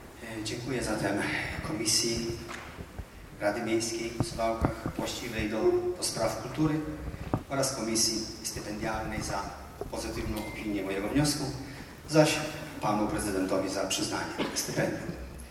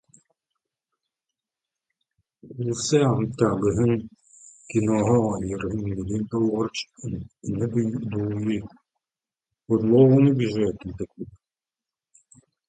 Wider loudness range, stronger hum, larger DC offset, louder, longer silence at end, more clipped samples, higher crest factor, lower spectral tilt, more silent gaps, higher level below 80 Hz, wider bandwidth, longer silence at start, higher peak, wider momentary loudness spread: second, 3 LU vs 6 LU; neither; neither; second, -31 LUFS vs -23 LUFS; second, 0 s vs 1.4 s; neither; about the same, 22 dB vs 20 dB; second, -4 dB/octave vs -7 dB/octave; neither; about the same, -48 dBFS vs -50 dBFS; first, 16.5 kHz vs 9.4 kHz; second, 0 s vs 2.45 s; second, -8 dBFS vs -4 dBFS; second, 13 LU vs 16 LU